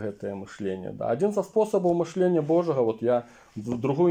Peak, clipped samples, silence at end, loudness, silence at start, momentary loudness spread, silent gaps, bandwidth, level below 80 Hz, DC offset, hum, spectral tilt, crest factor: -12 dBFS; under 0.1%; 0 s; -26 LUFS; 0 s; 11 LU; none; 10 kHz; -66 dBFS; under 0.1%; none; -8 dB/octave; 14 dB